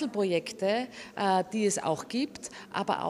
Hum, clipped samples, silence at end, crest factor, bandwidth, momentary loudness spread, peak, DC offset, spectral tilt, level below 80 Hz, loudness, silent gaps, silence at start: none; under 0.1%; 0 s; 18 dB; 14.5 kHz; 9 LU; -12 dBFS; under 0.1%; -4 dB/octave; -72 dBFS; -30 LUFS; none; 0 s